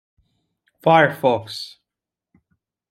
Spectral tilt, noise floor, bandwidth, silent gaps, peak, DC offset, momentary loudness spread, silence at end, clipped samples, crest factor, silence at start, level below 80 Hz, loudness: -6 dB/octave; -87 dBFS; 16 kHz; none; -2 dBFS; under 0.1%; 17 LU; 1.2 s; under 0.1%; 22 dB; 0.85 s; -68 dBFS; -18 LUFS